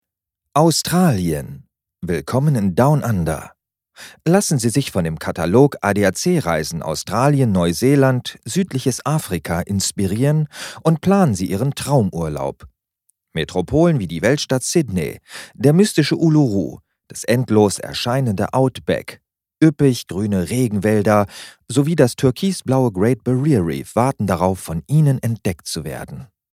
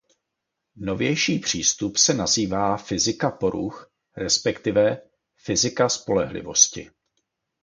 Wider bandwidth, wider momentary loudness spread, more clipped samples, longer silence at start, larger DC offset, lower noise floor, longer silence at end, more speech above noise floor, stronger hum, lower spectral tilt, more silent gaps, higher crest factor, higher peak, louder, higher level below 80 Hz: first, 16 kHz vs 11 kHz; about the same, 11 LU vs 13 LU; neither; second, 0.55 s vs 0.75 s; neither; about the same, -81 dBFS vs -81 dBFS; second, 0.3 s vs 0.75 s; first, 63 dB vs 59 dB; neither; first, -6 dB/octave vs -2.5 dB/octave; neither; second, 18 dB vs 24 dB; about the same, 0 dBFS vs -2 dBFS; first, -18 LUFS vs -21 LUFS; first, -46 dBFS vs -52 dBFS